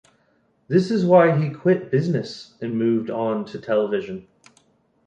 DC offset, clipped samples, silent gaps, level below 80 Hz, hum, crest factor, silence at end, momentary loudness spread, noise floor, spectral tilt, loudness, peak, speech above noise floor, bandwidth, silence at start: under 0.1%; under 0.1%; none; -64 dBFS; none; 18 dB; 0.85 s; 14 LU; -64 dBFS; -8 dB/octave; -21 LUFS; -2 dBFS; 43 dB; 9 kHz; 0.7 s